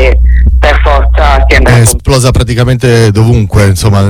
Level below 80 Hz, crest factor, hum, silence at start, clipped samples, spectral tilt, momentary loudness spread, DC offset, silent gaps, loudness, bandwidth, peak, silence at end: -8 dBFS; 4 dB; none; 0 s; 4%; -5.5 dB/octave; 3 LU; under 0.1%; none; -7 LUFS; 18.5 kHz; 0 dBFS; 0 s